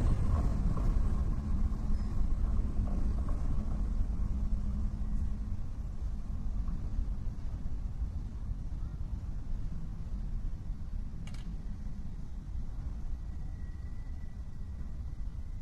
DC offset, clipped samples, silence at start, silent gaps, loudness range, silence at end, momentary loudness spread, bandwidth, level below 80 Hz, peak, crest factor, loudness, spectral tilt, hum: under 0.1%; under 0.1%; 0 s; none; 8 LU; 0 s; 10 LU; 7 kHz; -34 dBFS; -18 dBFS; 14 dB; -39 LUFS; -8.5 dB/octave; none